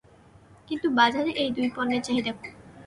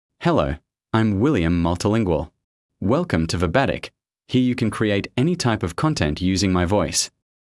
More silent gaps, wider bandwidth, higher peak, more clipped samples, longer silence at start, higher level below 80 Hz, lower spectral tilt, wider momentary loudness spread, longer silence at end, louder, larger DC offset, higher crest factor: second, none vs 2.44-2.69 s; about the same, 11.5 kHz vs 12 kHz; second, -8 dBFS vs -4 dBFS; neither; first, 0.7 s vs 0.2 s; second, -62 dBFS vs -42 dBFS; second, -4 dB/octave vs -5.5 dB/octave; first, 14 LU vs 7 LU; second, 0 s vs 0.35 s; second, -25 LUFS vs -21 LUFS; neither; about the same, 20 dB vs 16 dB